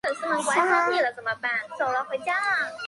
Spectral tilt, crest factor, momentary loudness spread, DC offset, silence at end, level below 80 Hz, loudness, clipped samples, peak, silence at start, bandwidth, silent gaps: -2 dB/octave; 18 dB; 6 LU; under 0.1%; 0 s; -72 dBFS; -24 LUFS; under 0.1%; -8 dBFS; 0.05 s; 11.5 kHz; none